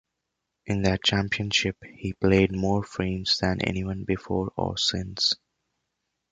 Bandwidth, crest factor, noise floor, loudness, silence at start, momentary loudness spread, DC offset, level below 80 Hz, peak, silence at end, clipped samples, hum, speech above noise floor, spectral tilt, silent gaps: 9.2 kHz; 20 dB; -82 dBFS; -25 LUFS; 0.65 s; 8 LU; under 0.1%; -44 dBFS; -8 dBFS; 0.95 s; under 0.1%; none; 56 dB; -4.5 dB/octave; none